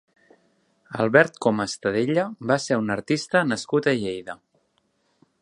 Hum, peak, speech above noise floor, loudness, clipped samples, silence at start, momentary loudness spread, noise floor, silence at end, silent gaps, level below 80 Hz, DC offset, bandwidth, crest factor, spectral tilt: none; -2 dBFS; 46 dB; -23 LUFS; under 0.1%; 0.9 s; 14 LU; -69 dBFS; 1.05 s; none; -64 dBFS; under 0.1%; 11 kHz; 22 dB; -5 dB/octave